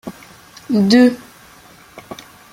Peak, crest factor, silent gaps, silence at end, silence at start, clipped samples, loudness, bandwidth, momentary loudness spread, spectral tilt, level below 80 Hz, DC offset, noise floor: -2 dBFS; 16 dB; none; 0.4 s; 0.05 s; under 0.1%; -13 LUFS; 15.5 kHz; 24 LU; -5.5 dB/octave; -56 dBFS; under 0.1%; -44 dBFS